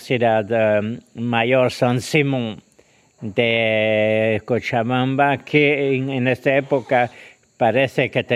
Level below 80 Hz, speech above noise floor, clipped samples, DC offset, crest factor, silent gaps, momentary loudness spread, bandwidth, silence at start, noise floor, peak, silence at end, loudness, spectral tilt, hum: -62 dBFS; 37 dB; under 0.1%; under 0.1%; 18 dB; none; 7 LU; 14 kHz; 0 s; -55 dBFS; 0 dBFS; 0 s; -19 LUFS; -6 dB/octave; none